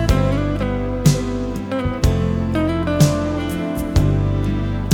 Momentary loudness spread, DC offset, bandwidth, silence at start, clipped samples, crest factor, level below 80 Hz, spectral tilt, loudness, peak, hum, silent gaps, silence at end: 6 LU; under 0.1%; 18.5 kHz; 0 s; under 0.1%; 16 dB; -26 dBFS; -6.5 dB/octave; -19 LUFS; -2 dBFS; none; none; 0 s